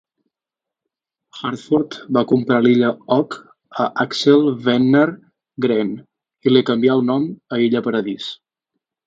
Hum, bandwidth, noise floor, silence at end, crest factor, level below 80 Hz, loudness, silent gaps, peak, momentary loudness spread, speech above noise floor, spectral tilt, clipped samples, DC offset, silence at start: none; 7.8 kHz; -86 dBFS; 0.7 s; 18 dB; -64 dBFS; -18 LUFS; none; 0 dBFS; 14 LU; 70 dB; -6.5 dB/octave; under 0.1%; under 0.1%; 1.35 s